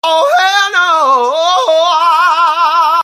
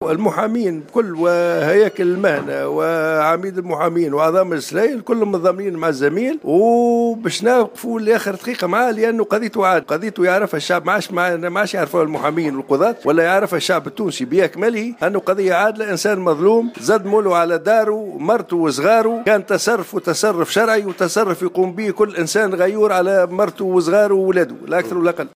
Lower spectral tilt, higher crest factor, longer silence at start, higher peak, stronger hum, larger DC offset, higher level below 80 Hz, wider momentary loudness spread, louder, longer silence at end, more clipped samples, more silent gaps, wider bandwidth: second, 1.5 dB/octave vs -5 dB/octave; about the same, 10 dB vs 14 dB; about the same, 0.05 s vs 0 s; about the same, 0 dBFS vs -2 dBFS; neither; neither; about the same, -64 dBFS vs -68 dBFS; second, 2 LU vs 5 LU; first, -9 LUFS vs -17 LUFS; about the same, 0 s vs 0.1 s; neither; neither; about the same, 15.5 kHz vs 16 kHz